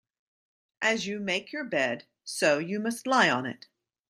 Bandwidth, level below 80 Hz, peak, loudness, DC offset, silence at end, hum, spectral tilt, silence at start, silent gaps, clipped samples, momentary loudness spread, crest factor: 15.5 kHz; -76 dBFS; -8 dBFS; -27 LUFS; under 0.1%; 0.55 s; none; -3.5 dB/octave; 0.8 s; none; under 0.1%; 14 LU; 22 dB